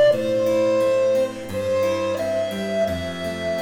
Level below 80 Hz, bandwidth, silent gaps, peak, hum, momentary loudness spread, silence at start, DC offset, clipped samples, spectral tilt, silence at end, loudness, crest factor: -52 dBFS; 17 kHz; none; -8 dBFS; none; 8 LU; 0 s; under 0.1%; under 0.1%; -5.5 dB/octave; 0 s; -22 LUFS; 12 dB